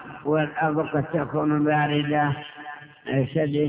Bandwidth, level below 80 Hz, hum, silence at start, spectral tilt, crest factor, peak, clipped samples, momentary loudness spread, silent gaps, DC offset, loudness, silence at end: 4 kHz; -58 dBFS; none; 0 s; -11 dB/octave; 14 dB; -10 dBFS; under 0.1%; 15 LU; none; under 0.1%; -24 LUFS; 0 s